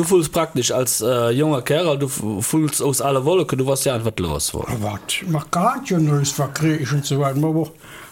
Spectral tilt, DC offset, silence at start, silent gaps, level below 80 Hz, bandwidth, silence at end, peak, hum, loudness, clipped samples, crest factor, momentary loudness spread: -5 dB/octave; under 0.1%; 0 s; none; -46 dBFS; 17 kHz; 0 s; -6 dBFS; none; -20 LUFS; under 0.1%; 14 dB; 5 LU